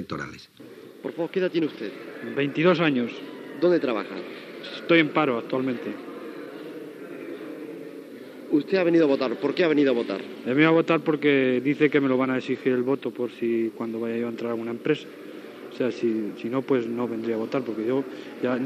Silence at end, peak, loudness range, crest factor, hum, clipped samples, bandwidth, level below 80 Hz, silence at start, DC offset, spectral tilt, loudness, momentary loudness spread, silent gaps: 0 s; -6 dBFS; 7 LU; 20 dB; none; under 0.1%; 13.5 kHz; -74 dBFS; 0 s; under 0.1%; -7 dB/octave; -24 LUFS; 18 LU; none